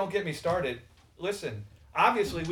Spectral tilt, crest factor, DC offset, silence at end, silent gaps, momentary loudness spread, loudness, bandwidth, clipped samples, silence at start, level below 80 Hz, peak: -5 dB/octave; 22 dB; under 0.1%; 0 s; none; 14 LU; -30 LUFS; 18.5 kHz; under 0.1%; 0 s; -56 dBFS; -8 dBFS